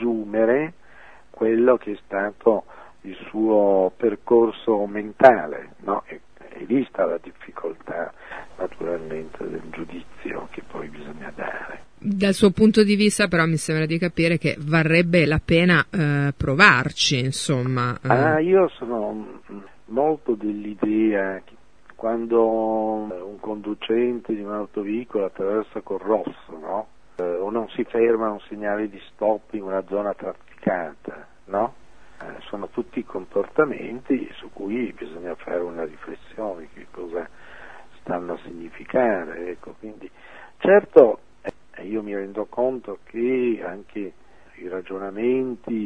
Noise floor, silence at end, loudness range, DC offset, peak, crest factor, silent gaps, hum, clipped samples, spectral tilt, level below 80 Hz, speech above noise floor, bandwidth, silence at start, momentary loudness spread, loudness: -49 dBFS; 0 s; 11 LU; 0.5%; 0 dBFS; 22 dB; none; none; under 0.1%; -5.5 dB/octave; -52 dBFS; 27 dB; 11 kHz; 0 s; 20 LU; -22 LUFS